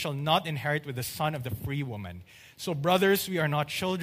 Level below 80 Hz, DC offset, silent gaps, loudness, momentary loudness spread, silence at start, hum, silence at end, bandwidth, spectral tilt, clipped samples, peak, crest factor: -58 dBFS; under 0.1%; none; -29 LUFS; 13 LU; 0 s; none; 0 s; 15.5 kHz; -5 dB/octave; under 0.1%; -10 dBFS; 18 dB